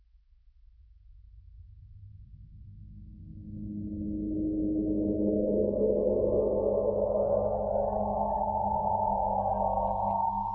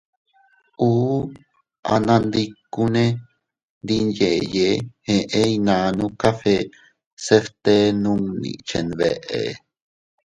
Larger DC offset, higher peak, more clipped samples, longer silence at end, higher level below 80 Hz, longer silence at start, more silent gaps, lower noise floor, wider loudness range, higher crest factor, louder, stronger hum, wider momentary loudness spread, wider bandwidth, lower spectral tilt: neither; second, -16 dBFS vs 0 dBFS; neither; second, 0 s vs 0.7 s; about the same, -46 dBFS vs -50 dBFS; first, 1.1 s vs 0.8 s; second, none vs 1.79-1.83 s, 3.63-3.81 s, 7.06-7.17 s; about the same, -60 dBFS vs -59 dBFS; first, 13 LU vs 2 LU; second, 14 dB vs 20 dB; second, -29 LUFS vs -20 LUFS; neither; first, 16 LU vs 11 LU; second, 1.8 kHz vs 11 kHz; first, -14 dB/octave vs -6 dB/octave